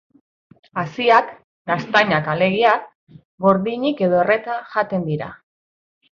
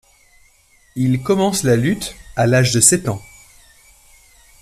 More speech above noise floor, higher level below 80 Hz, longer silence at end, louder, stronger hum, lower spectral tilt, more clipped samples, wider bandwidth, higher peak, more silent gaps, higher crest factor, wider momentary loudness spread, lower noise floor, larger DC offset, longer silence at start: first, over 72 dB vs 38 dB; second, -60 dBFS vs -46 dBFS; second, 0.8 s vs 1.4 s; second, -19 LUFS vs -16 LUFS; neither; first, -7 dB/octave vs -4.5 dB/octave; neither; second, 7.2 kHz vs 14.5 kHz; about the same, -2 dBFS vs 0 dBFS; first, 1.44-1.65 s, 2.95-3.07 s, 3.25-3.38 s vs none; about the same, 18 dB vs 20 dB; about the same, 12 LU vs 14 LU; first, under -90 dBFS vs -54 dBFS; neither; second, 0.75 s vs 0.95 s